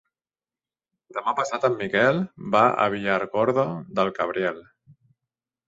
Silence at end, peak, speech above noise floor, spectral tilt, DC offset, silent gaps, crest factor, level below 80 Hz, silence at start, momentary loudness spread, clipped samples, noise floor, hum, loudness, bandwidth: 1.05 s; -4 dBFS; over 67 dB; -6 dB/octave; under 0.1%; none; 22 dB; -64 dBFS; 1.15 s; 8 LU; under 0.1%; under -90 dBFS; none; -23 LUFS; 7.8 kHz